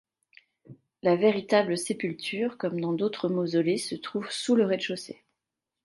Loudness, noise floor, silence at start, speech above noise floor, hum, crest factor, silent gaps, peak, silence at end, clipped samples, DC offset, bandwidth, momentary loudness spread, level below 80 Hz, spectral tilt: -27 LUFS; -87 dBFS; 0.7 s; 60 dB; none; 20 dB; none; -10 dBFS; 0.7 s; under 0.1%; under 0.1%; 11.5 kHz; 10 LU; -76 dBFS; -5 dB/octave